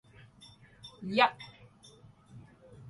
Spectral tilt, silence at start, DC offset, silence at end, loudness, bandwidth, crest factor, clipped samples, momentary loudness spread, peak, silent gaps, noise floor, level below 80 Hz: -5 dB/octave; 0.85 s; under 0.1%; 0 s; -29 LUFS; 11.5 kHz; 26 dB; under 0.1%; 28 LU; -10 dBFS; none; -58 dBFS; -70 dBFS